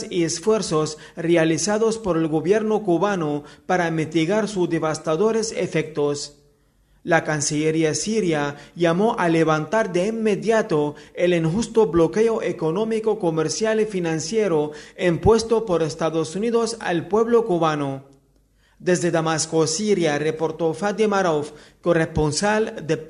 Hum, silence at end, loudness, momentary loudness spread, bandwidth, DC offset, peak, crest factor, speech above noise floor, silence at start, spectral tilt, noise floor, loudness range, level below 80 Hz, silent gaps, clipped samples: none; 0 s; -21 LUFS; 6 LU; 11.5 kHz; under 0.1%; -2 dBFS; 20 dB; 39 dB; 0 s; -5 dB/octave; -59 dBFS; 2 LU; -48 dBFS; none; under 0.1%